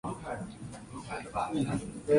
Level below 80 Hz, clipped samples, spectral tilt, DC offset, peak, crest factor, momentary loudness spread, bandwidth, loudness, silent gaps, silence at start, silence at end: -54 dBFS; under 0.1%; -6.5 dB/octave; under 0.1%; -14 dBFS; 20 dB; 12 LU; 11.5 kHz; -37 LUFS; none; 0.05 s; 0 s